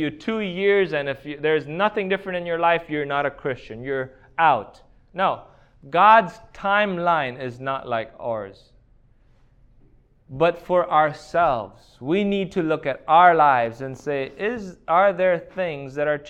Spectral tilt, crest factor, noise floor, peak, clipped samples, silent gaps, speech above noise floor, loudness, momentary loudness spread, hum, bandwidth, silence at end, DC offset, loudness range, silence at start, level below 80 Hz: -6.5 dB/octave; 20 dB; -55 dBFS; -2 dBFS; under 0.1%; none; 34 dB; -21 LUFS; 13 LU; none; 8.8 kHz; 0 s; under 0.1%; 6 LU; 0 s; -54 dBFS